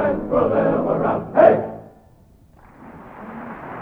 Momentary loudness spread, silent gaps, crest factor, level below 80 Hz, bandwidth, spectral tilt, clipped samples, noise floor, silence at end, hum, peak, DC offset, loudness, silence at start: 23 LU; none; 20 dB; -48 dBFS; 4.5 kHz; -10 dB/octave; under 0.1%; -51 dBFS; 0 s; none; 0 dBFS; under 0.1%; -18 LUFS; 0 s